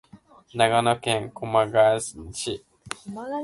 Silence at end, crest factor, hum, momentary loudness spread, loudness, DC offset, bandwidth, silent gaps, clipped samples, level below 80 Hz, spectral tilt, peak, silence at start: 0 s; 20 dB; none; 17 LU; -23 LUFS; under 0.1%; 11.5 kHz; none; under 0.1%; -56 dBFS; -4 dB/octave; -4 dBFS; 0.15 s